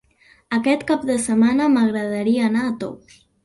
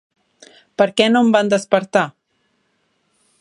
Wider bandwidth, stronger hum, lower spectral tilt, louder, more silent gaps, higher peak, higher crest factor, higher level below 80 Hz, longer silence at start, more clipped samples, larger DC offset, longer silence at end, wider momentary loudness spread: about the same, 11.5 kHz vs 11 kHz; neither; about the same, -5 dB/octave vs -4.5 dB/octave; second, -19 LUFS vs -16 LUFS; neither; second, -6 dBFS vs 0 dBFS; about the same, 14 dB vs 18 dB; first, -56 dBFS vs -66 dBFS; second, 0.5 s vs 0.8 s; neither; neither; second, 0.5 s vs 1.3 s; about the same, 9 LU vs 8 LU